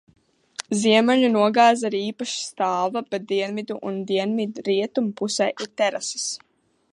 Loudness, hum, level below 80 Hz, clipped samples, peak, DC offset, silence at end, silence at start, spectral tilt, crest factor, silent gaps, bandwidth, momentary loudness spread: -22 LUFS; none; -74 dBFS; under 0.1%; -4 dBFS; under 0.1%; 0.55 s; 0.6 s; -3.5 dB/octave; 18 dB; none; 11 kHz; 12 LU